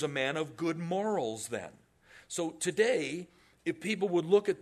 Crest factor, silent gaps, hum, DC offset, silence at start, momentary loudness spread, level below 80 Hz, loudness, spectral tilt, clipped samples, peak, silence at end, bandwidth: 20 dB; none; none; under 0.1%; 0 s; 12 LU; -74 dBFS; -32 LUFS; -4.5 dB/octave; under 0.1%; -12 dBFS; 0 s; 13.5 kHz